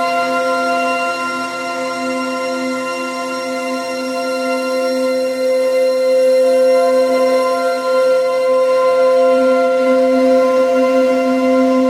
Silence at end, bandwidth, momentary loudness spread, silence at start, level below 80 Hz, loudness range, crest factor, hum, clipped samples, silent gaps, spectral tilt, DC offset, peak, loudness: 0 s; 14.5 kHz; 8 LU; 0 s; -66 dBFS; 7 LU; 12 dB; none; under 0.1%; none; -3.5 dB/octave; under 0.1%; -4 dBFS; -15 LUFS